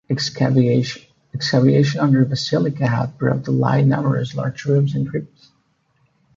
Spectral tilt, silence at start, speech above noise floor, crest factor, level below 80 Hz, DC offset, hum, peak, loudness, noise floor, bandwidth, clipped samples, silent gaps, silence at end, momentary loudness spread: -7 dB/octave; 0.1 s; 45 dB; 16 dB; -54 dBFS; under 0.1%; none; -2 dBFS; -18 LUFS; -63 dBFS; 7.6 kHz; under 0.1%; none; 1.1 s; 9 LU